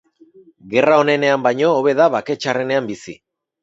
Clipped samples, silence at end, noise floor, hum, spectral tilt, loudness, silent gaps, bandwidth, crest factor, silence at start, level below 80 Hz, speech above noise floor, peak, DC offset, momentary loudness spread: under 0.1%; 0.5 s; -48 dBFS; none; -5.5 dB/octave; -16 LUFS; none; 8 kHz; 18 dB; 0.65 s; -64 dBFS; 32 dB; 0 dBFS; under 0.1%; 11 LU